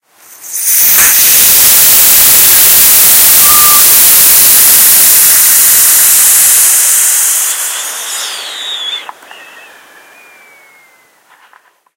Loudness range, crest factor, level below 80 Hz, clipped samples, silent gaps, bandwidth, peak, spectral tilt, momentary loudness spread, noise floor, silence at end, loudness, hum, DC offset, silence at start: 18 LU; 8 dB; -42 dBFS; 7%; none; over 20 kHz; 0 dBFS; 2 dB/octave; 15 LU; -46 dBFS; 2.85 s; -2 LUFS; none; under 0.1%; 0.45 s